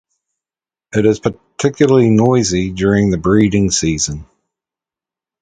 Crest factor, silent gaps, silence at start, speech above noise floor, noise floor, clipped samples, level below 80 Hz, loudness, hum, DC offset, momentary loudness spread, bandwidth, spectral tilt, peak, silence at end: 16 dB; none; 0.95 s; over 77 dB; under -90 dBFS; under 0.1%; -38 dBFS; -14 LUFS; none; under 0.1%; 9 LU; 9.4 kHz; -5.5 dB/octave; 0 dBFS; 1.2 s